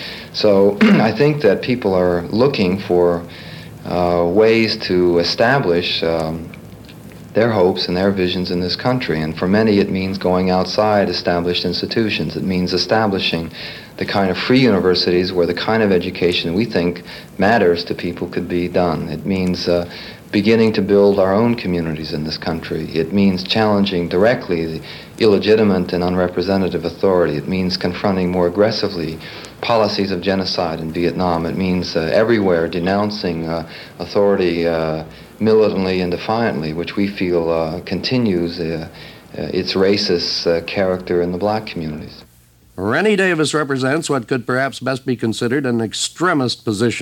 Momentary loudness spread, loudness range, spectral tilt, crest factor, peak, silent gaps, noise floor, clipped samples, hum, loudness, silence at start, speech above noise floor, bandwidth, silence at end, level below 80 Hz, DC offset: 10 LU; 3 LU; -6 dB/octave; 14 dB; -2 dBFS; none; -49 dBFS; under 0.1%; none; -17 LUFS; 0 s; 33 dB; 17.5 kHz; 0 s; -46 dBFS; under 0.1%